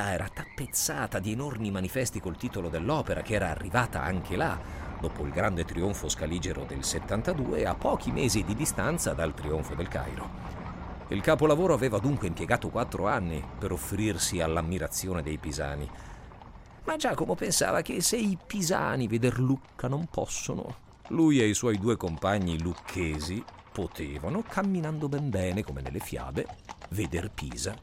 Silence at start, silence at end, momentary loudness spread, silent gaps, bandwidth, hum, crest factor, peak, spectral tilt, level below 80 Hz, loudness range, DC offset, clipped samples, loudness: 0 s; 0 s; 11 LU; none; 16 kHz; none; 20 dB; -10 dBFS; -5 dB/octave; -44 dBFS; 4 LU; under 0.1%; under 0.1%; -30 LUFS